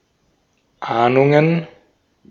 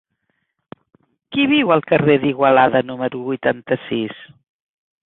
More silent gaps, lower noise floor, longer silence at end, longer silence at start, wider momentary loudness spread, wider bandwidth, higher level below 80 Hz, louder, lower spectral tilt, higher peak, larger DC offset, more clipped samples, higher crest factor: neither; second, -63 dBFS vs -71 dBFS; second, 0.65 s vs 0.8 s; second, 0.8 s vs 1.3 s; first, 18 LU vs 10 LU; first, 7.2 kHz vs 4.1 kHz; about the same, -62 dBFS vs -60 dBFS; about the same, -16 LUFS vs -17 LUFS; second, -8.5 dB/octave vs -10 dB/octave; about the same, -2 dBFS vs -2 dBFS; neither; neither; about the same, 18 dB vs 18 dB